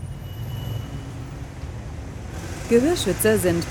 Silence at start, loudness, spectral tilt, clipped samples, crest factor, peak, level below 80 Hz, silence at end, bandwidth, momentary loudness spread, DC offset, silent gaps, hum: 0 s; -24 LUFS; -5 dB/octave; under 0.1%; 18 dB; -6 dBFS; -38 dBFS; 0 s; 19.5 kHz; 16 LU; under 0.1%; none; none